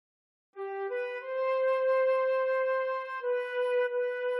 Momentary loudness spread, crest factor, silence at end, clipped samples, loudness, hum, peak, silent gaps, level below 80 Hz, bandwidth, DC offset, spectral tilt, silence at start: 8 LU; 10 dB; 0 s; under 0.1%; -30 LUFS; none; -20 dBFS; none; under -90 dBFS; 5.6 kHz; under 0.1%; -1 dB/octave; 0.55 s